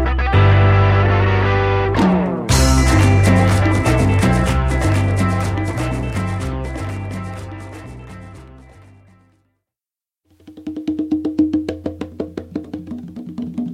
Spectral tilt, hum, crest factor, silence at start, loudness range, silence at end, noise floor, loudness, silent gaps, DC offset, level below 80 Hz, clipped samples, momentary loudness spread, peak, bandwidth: -6 dB/octave; none; 16 dB; 0 s; 18 LU; 0 s; under -90 dBFS; -16 LUFS; none; under 0.1%; -26 dBFS; under 0.1%; 18 LU; -2 dBFS; 13.5 kHz